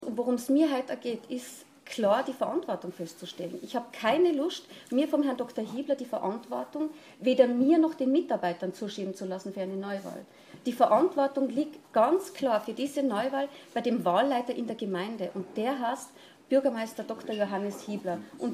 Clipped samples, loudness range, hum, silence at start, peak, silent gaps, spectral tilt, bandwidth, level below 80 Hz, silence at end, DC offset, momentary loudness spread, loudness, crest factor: under 0.1%; 4 LU; none; 0 s; -8 dBFS; none; -5.5 dB/octave; 15.5 kHz; -78 dBFS; 0 s; under 0.1%; 13 LU; -29 LUFS; 20 dB